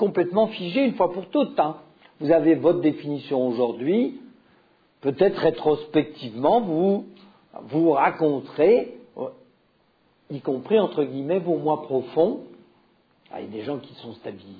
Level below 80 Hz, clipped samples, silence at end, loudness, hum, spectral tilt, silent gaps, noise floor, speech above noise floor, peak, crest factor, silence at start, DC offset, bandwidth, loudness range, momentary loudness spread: -64 dBFS; under 0.1%; 0 s; -23 LUFS; none; -9.5 dB/octave; none; -64 dBFS; 41 dB; -6 dBFS; 18 dB; 0 s; under 0.1%; 5 kHz; 4 LU; 16 LU